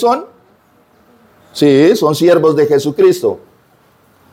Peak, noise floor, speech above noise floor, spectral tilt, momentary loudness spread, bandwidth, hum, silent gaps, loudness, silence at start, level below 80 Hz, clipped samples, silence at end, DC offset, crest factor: 0 dBFS; -51 dBFS; 40 dB; -6 dB/octave; 10 LU; 16.5 kHz; none; none; -11 LUFS; 0 s; -60 dBFS; under 0.1%; 0.95 s; under 0.1%; 12 dB